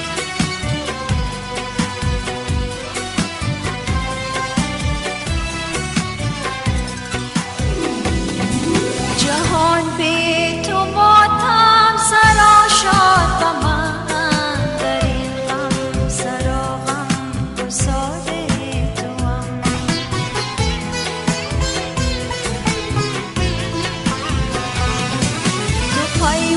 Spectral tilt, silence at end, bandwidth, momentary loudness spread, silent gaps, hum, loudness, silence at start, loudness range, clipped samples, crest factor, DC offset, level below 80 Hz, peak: -4 dB/octave; 0 s; 11.5 kHz; 11 LU; none; none; -17 LUFS; 0 s; 10 LU; under 0.1%; 18 dB; under 0.1%; -28 dBFS; 0 dBFS